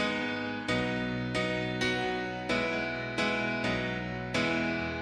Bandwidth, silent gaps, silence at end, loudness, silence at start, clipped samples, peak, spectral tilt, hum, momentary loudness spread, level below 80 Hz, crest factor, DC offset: 11.5 kHz; none; 0 s; -31 LUFS; 0 s; under 0.1%; -18 dBFS; -5 dB/octave; none; 4 LU; -54 dBFS; 14 dB; under 0.1%